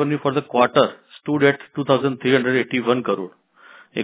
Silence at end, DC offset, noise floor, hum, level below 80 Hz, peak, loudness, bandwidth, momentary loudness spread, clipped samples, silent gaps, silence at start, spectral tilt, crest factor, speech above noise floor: 0 s; under 0.1%; -48 dBFS; none; -64 dBFS; -2 dBFS; -20 LUFS; 4 kHz; 9 LU; under 0.1%; none; 0 s; -10 dB/octave; 20 dB; 29 dB